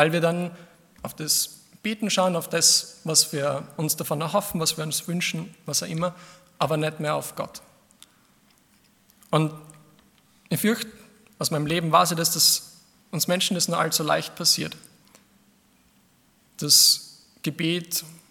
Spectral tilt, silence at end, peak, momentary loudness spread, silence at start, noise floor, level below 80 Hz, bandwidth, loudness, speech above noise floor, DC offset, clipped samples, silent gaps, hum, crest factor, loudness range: -2.5 dB/octave; 0.15 s; -2 dBFS; 15 LU; 0 s; -61 dBFS; -66 dBFS; 18 kHz; -23 LUFS; 37 dB; under 0.1%; under 0.1%; none; none; 24 dB; 8 LU